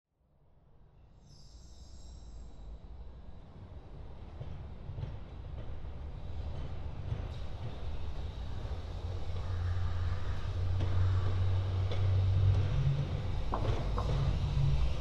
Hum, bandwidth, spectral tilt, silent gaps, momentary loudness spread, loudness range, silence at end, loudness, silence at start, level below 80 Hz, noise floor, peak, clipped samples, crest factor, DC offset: none; 7.8 kHz; -7.5 dB/octave; none; 20 LU; 20 LU; 0 s; -36 LUFS; 1 s; -40 dBFS; -66 dBFS; -18 dBFS; under 0.1%; 16 dB; under 0.1%